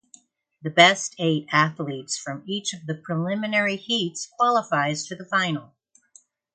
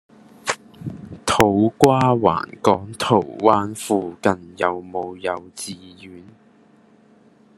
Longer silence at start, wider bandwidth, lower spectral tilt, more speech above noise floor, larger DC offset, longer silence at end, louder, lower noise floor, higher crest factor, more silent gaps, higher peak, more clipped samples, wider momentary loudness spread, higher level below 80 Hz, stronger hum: first, 0.65 s vs 0.45 s; second, 9.4 kHz vs 13 kHz; second, -3.5 dB/octave vs -5.5 dB/octave; about the same, 34 dB vs 33 dB; neither; second, 0.9 s vs 1.35 s; second, -23 LUFS vs -20 LUFS; first, -57 dBFS vs -53 dBFS; about the same, 24 dB vs 22 dB; neither; about the same, -2 dBFS vs 0 dBFS; neither; second, 14 LU vs 17 LU; second, -70 dBFS vs -52 dBFS; neither